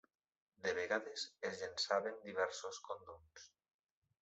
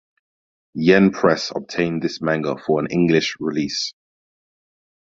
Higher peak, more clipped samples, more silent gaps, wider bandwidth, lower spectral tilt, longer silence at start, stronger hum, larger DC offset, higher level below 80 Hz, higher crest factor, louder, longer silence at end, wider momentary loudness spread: second, -20 dBFS vs -2 dBFS; neither; neither; about the same, 8.2 kHz vs 7.8 kHz; second, -2 dB/octave vs -5.5 dB/octave; second, 0.6 s vs 0.75 s; neither; neither; second, -84 dBFS vs -56 dBFS; about the same, 24 dB vs 20 dB; second, -42 LUFS vs -20 LUFS; second, 0.75 s vs 1.1 s; first, 20 LU vs 10 LU